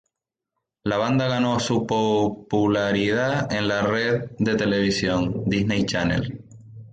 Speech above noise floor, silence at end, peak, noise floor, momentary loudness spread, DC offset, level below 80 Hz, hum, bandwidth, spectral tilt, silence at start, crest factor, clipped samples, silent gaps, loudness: 63 dB; 0.05 s; -8 dBFS; -85 dBFS; 3 LU; under 0.1%; -48 dBFS; none; 9.2 kHz; -5.5 dB/octave; 0.85 s; 14 dB; under 0.1%; none; -22 LUFS